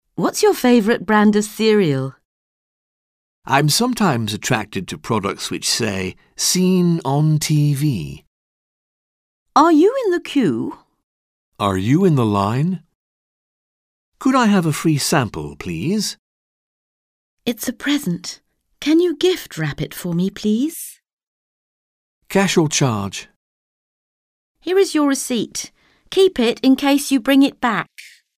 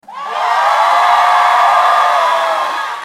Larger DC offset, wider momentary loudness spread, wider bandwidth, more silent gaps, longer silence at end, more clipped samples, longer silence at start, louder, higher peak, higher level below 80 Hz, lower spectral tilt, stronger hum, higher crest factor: neither; first, 13 LU vs 7 LU; about the same, 16 kHz vs 16 kHz; first, 2.25-3.42 s, 8.27-9.46 s, 11.03-11.52 s, 12.95-14.12 s, 16.19-17.37 s, 21.13-21.17 s, 21.23-22.21 s, 23.36-24.55 s vs none; first, 0.3 s vs 0 s; neither; about the same, 0.2 s vs 0.1 s; second, -18 LUFS vs -11 LUFS; about the same, -2 dBFS vs 0 dBFS; first, -52 dBFS vs -66 dBFS; first, -5 dB/octave vs 0.5 dB/octave; neither; first, 18 dB vs 12 dB